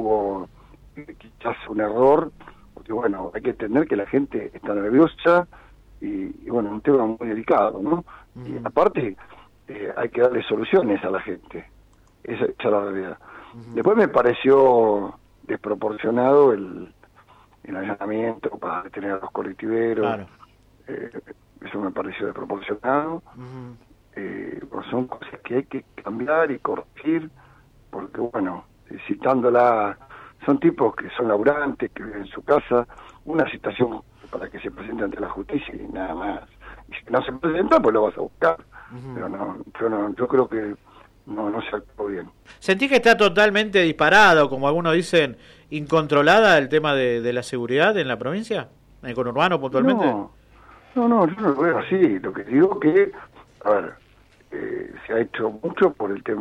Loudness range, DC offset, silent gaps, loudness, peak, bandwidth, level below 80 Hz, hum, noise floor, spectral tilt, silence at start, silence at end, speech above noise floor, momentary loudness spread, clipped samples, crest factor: 10 LU; under 0.1%; none; -21 LUFS; -6 dBFS; 12 kHz; -54 dBFS; none; -54 dBFS; -6 dB/octave; 0 s; 0 s; 32 dB; 18 LU; under 0.1%; 18 dB